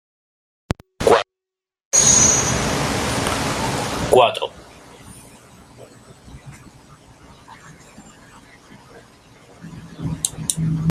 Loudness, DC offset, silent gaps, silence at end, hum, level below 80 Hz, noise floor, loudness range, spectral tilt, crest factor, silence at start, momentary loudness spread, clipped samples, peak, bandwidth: -17 LUFS; under 0.1%; 1.85-1.91 s; 0 s; none; -42 dBFS; -88 dBFS; 16 LU; -3 dB/octave; 22 dB; 1 s; 20 LU; under 0.1%; 0 dBFS; 16 kHz